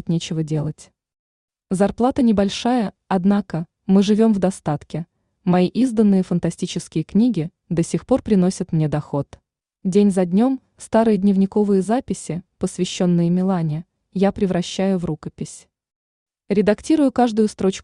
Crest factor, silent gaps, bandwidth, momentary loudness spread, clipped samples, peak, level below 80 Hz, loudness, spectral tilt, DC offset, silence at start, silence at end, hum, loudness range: 16 dB; 1.19-1.48 s, 15.96-16.26 s; 11 kHz; 11 LU; under 0.1%; -4 dBFS; -50 dBFS; -20 LUFS; -7 dB/octave; under 0.1%; 0.05 s; 0 s; none; 3 LU